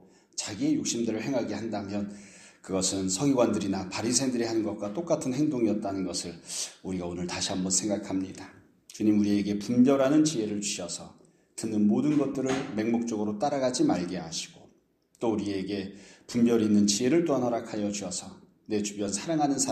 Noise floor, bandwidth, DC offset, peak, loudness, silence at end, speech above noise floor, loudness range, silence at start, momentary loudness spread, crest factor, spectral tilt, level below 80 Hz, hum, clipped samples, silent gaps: -66 dBFS; 13.5 kHz; under 0.1%; -10 dBFS; -28 LUFS; 0 s; 38 dB; 4 LU; 0.35 s; 12 LU; 18 dB; -4.5 dB/octave; -66 dBFS; none; under 0.1%; none